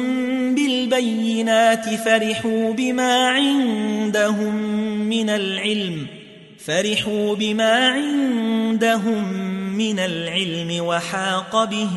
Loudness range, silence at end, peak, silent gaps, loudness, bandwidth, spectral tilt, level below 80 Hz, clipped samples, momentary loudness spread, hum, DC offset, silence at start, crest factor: 3 LU; 0 s; -4 dBFS; none; -20 LUFS; 12 kHz; -4 dB/octave; -64 dBFS; under 0.1%; 7 LU; none; under 0.1%; 0 s; 16 dB